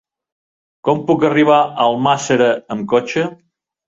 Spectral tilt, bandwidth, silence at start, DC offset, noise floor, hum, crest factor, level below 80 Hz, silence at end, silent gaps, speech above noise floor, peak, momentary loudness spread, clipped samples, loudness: -5.5 dB/octave; 8 kHz; 0.85 s; under 0.1%; under -90 dBFS; none; 14 dB; -58 dBFS; 0.55 s; none; over 75 dB; -2 dBFS; 9 LU; under 0.1%; -15 LUFS